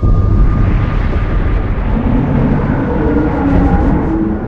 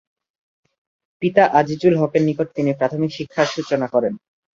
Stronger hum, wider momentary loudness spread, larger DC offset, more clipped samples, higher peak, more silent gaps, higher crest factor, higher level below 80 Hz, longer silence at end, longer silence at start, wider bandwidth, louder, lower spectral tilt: neither; second, 4 LU vs 8 LU; neither; neither; about the same, 0 dBFS vs -2 dBFS; neither; second, 10 dB vs 18 dB; first, -14 dBFS vs -60 dBFS; second, 0 s vs 0.4 s; second, 0 s vs 1.2 s; second, 4.9 kHz vs 7.6 kHz; first, -14 LUFS vs -19 LUFS; first, -10 dB/octave vs -6.5 dB/octave